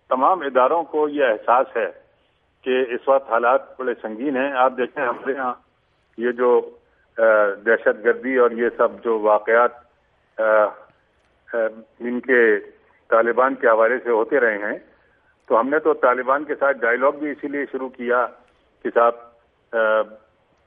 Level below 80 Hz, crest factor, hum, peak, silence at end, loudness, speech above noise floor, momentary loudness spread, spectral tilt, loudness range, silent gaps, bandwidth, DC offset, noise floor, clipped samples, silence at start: -68 dBFS; 18 dB; none; -2 dBFS; 0.5 s; -20 LUFS; 44 dB; 11 LU; -8 dB/octave; 3 LU; none; 3.7 kHz; under 0.1%; -63 dBFS; under 0.1%; 0.1 s